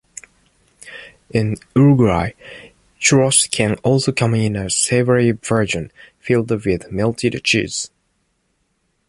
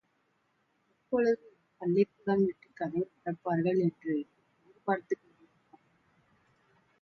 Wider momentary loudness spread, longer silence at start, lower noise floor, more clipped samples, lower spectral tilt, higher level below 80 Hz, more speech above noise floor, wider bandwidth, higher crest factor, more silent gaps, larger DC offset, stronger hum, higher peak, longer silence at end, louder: first, 22 LU vs 10 LU; second, 0.85 s vs 1.1 s; second, -67 dBFS vs -75 dBFS; neither; second, -4.5 dB/octave vs -9 dB/octave; first, -44 dBFS vs -76 dBFS; first, 50 dB vs 44 dB; first, 11.5 kHz vs 6.6 kHz; about the same, 18 dB vs 20 dB; neither; neither; neither; first, 0 dBFS vs -14 dBFS; second, 1.2 s vs 1.85 s; first, -17 LUFS vs -32 LUFS